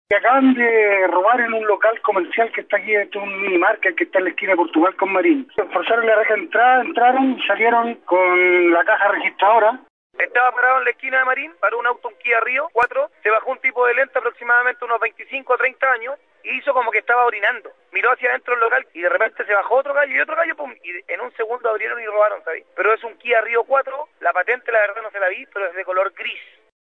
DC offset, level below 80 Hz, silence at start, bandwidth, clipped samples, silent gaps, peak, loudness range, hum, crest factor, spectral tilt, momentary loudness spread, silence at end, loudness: under 0.1%; -72 dBFS; 0.1 s; 4.1 kHz; under 0.1%; 9.90-10.10 s; -6 dBFS; 5 LU; none; 12 dB; -5.5 dB/octave; 9 LU; 0.4 s; -18 LUFS